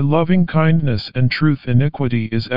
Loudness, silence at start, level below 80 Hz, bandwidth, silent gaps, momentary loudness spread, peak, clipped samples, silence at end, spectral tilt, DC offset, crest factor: -17 LUFS; 0 s; -42 dBFS; 5.4 kHz; none; 5 LU; -2 dBFS; under 0.1%; 0 s; -6.5 dB/octave; 3%; 14 dB